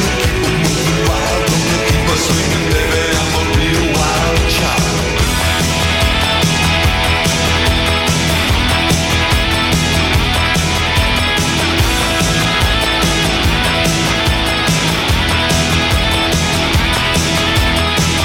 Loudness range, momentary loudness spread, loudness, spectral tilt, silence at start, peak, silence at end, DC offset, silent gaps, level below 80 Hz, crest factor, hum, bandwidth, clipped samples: 1 LU; 1 LU; -13 LUFS; -3.5 dB/octave; 0 s; 0 dBFS; 0 s; under 0.1%; none; -22 dBFS; 12 dB; none; 18.5 kHz; under 0.1%